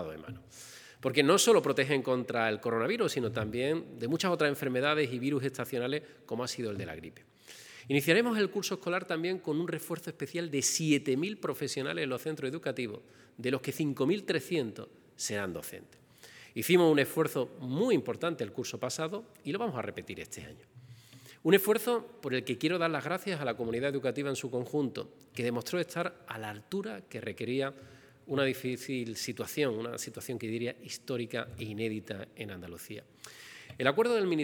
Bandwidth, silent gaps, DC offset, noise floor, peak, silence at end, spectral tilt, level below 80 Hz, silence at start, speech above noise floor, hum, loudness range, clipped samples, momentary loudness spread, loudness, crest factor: over 20 kHz; none; under 0.1%; -55 dBFS; -8 dBFS; 0 s; -4.5 dB/octave; -74 dBFS; 0 s; 23 dB; none; 6 LU; under 0.1%; 17 LU; -32 LUFS; 24 dB